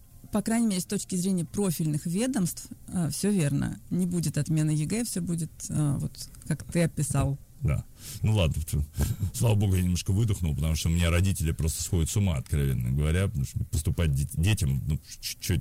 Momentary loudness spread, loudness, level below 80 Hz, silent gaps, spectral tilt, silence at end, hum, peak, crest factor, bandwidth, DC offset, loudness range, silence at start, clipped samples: 7 LU; -28 LUFS; -40 dBFS; none; -5.5 dB/octave; 0 s; none; -14 dBFS; 14 dB; 16 kHz; under 0.1%; 3 LU; 0.15 s; under 0.1%